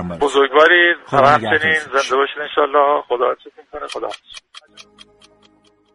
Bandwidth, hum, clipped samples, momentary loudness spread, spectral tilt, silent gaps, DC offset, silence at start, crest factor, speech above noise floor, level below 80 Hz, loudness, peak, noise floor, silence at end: 11.5 kHz; none; under 0.1%; 20 LU; -4 dB/octave; none; under 0.1%; 0 s; 18 dB; 39 dB; -54 dBFS; -15 LUFS; 0 dBFS; -54 dBFS; 1.15 s